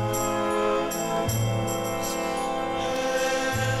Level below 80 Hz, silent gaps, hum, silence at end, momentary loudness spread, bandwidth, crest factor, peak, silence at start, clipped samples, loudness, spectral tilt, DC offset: -48 dBFS; none; none; 0 s; 3 LU; 16 kHz; 14 dB; -12 dBFS; 0 s; under 0.1%; -26 LUFS; -4.5 dB/octave; under 0.1%